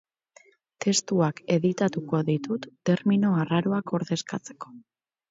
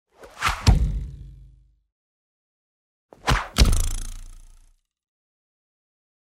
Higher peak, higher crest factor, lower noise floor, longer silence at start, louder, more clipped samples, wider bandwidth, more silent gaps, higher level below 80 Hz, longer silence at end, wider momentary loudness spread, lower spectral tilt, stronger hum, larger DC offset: second, -10 dBFS vs -4 dBFS; about the same, 18 dB vs 22 dB; about the same, -58 dBFS vs -56 dBFS; first, 0.8 s vs 0.2 s; second, -26 LUFS vs -23 LUFS; neither; second, 8 kHz vs 16 kHz; second, none vs 1.92-3.09 s; second, -68 dBFS vs -28 dBFS; second, 0.5 s vs 1.9 s; second, 12 LU vs 19 LU; first, -5.5 dB/octave vs -4 dB/octave; neither; neither